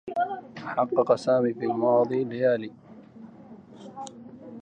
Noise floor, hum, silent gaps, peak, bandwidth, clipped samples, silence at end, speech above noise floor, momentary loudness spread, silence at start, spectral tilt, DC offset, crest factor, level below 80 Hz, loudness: -47 dBFS; none; none; -8 dBFS; 9.4 kHz; under 0.1%; 0.05 s; 23 dB; 23 LU; 0.05 s; -7 dB/octave; under 0.1%; 18 dB; -72 dBFS; -25 LUFS